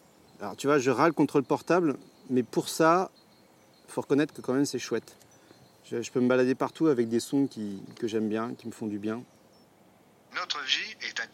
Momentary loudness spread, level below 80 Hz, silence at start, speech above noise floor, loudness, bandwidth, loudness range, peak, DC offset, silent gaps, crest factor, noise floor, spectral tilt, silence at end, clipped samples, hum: 14 LU; -78 dBFS; 0.4 s; 32 dB; -28 LUFS; 16 kHz; 6 LU; -8 dBFS; under 0.1%; none; 20 dB; -59 dBFS; -5 dB/octave; 0.05 s; under 0.1%; none